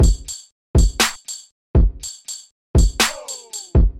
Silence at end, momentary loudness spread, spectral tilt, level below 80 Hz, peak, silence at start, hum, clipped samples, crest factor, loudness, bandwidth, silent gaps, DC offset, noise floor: 0 s; 15 LU; -4 dB/octave; -20 dBFS; -4 dBFS; 0 s; none; under 0.1%; 14 dB; -20 LUFS; 16.5 kHz; 0.52-0.74 s, 1.51-1.74 s, 2.51-2.74 s; under 0.1%; -34 dBFS